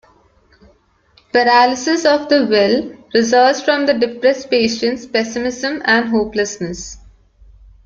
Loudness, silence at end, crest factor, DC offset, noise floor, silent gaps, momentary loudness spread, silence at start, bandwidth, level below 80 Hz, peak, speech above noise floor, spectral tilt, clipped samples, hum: -15 LUFS; 0.9 s; 16 dB; under 0.1%; -54 dBFS; none; 8 LU; 1.35 s; 7.6 kHz; -48 dBFS; 0 dBFS; 39 dB; -3.5 dB/octave; under 0.1%; none